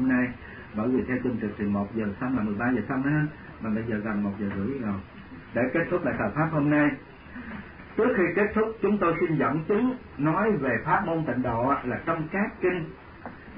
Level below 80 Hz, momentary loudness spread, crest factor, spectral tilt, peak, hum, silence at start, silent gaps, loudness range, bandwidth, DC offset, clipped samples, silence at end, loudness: -50 dBFS; 15 LU; 16 dB; -12 dB/octave; -12 dBFS; none; 0 s; none; 4 LU; 5.2 kHz; under 0.1%; under 0.1%; 0 s; -27 LUFS